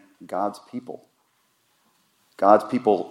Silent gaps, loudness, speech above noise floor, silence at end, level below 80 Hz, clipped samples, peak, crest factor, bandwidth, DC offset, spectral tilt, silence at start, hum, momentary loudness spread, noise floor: none; -22 LUFS; 45 dB; 0 s; -80 dBFS; under 0.1%; -2 dBFS; 24 dB; 13.5 kHz; under 0.1%; -7 dB/octave; 0.2 s; none; 21 LU; -67 dBFS